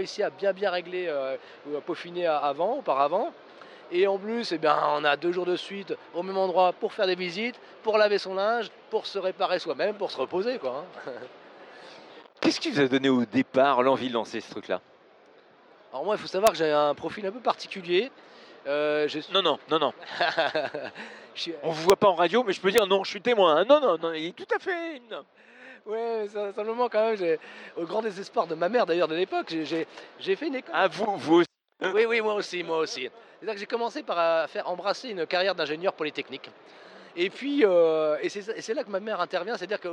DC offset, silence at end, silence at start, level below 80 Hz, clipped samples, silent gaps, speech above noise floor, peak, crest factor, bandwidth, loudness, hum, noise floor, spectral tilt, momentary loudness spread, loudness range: under 0.1%; 0 s; 0 s; -74 dBFS; under 0.1%; none; 29 dB; -4 dBFS; 22 dB; 12.5 kHz; -27 LUFS; none; -56 dBFS; -4.5 dB/octave; 13 LU; 5 LU